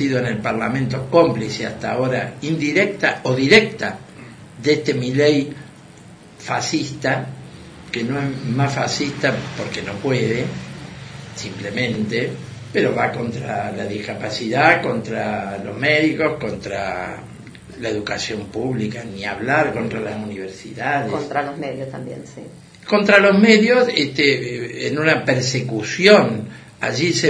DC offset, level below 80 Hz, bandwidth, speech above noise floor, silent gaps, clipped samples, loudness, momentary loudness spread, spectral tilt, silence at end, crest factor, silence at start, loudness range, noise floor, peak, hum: under 0.1%; -52 dBFS; 10.5 kHz; 23 dB; none; under 0.1%; -19 LUFS; 19 LU; -5 dB/octave; 0 s; 20 dB; 0 s; 8 LU; -42 dBFS; 0 dBFS; none